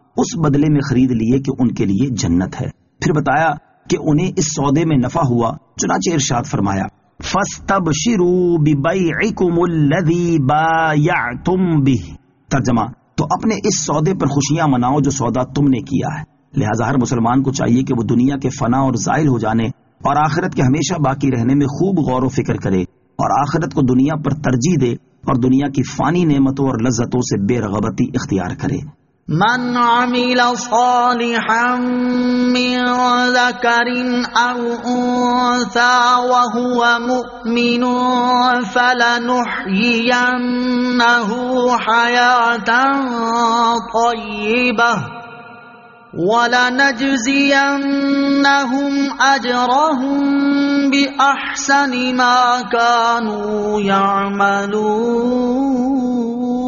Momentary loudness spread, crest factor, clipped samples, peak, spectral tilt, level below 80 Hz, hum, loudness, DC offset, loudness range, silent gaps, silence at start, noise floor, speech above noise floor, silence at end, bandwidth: 7 LU; 14 dB; under 0.1%; -2 dBFS; -4.5 dB/octave; -44 dBFS; none; -15 LUFS; under 0.1%; 3 LU; none; 0.15 s; -41 dBFS; 26 dB; 0 s; 7.4 kHz